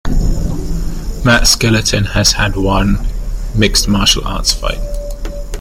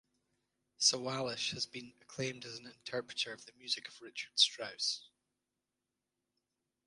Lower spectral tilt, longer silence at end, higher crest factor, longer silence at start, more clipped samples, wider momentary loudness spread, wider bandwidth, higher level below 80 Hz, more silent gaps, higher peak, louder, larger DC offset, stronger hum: first, -3.5 dB/octave vs -1.5 dB/octave; second, 0 s vs 1.85 s; second, 14 dB vs 26 dB; second, 0.05 s vs 0.8 s; neither; about the same, 15 LU vs 17 LU; first, 16.5 kHz vs 11.5 kHz; first, -18 dBFS vs -80 dBFS; neither; first, 0 dBFS vs -14 dBFS; first, -13 LUFS vs -35 LUFS; neither; neither